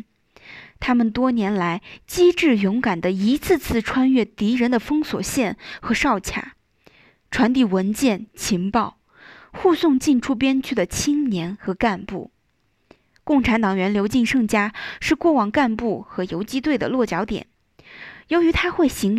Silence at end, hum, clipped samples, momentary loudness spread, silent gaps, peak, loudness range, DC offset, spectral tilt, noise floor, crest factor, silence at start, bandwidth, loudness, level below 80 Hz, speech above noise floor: 0 s; none; under 0.1%; 11 LU; none; -4 dBFS; 3 LU; under 0.1%; -5 dB/octave; -67 dBFS; 18 dB; 0.45 s; 15.5 kHz; -20 LUFS; -44 dBFS; 47 dB